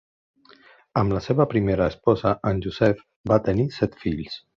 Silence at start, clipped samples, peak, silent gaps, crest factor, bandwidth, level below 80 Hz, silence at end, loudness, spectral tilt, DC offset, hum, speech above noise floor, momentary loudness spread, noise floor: 0.95 s; under 0.1%; -4 dBFS; 3.16-3.24 s; 20 dB; 7.2 kHz; -44 dBFS; 0.2 s; -23 LUFS; -8.5 dB/octave; under 0.1%; none; 31 dB; 8 LU; -53 dBFS